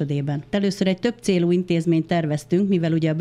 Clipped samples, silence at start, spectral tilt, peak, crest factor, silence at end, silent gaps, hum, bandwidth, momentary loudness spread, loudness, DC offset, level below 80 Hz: under 0.1%; 0 s; -7 dB/octave; -8 dBFS; 14 dB; 0 s; none; none; 12 kHz; 4 LU; -22 LUFS; under 0.1%; -56 dBFS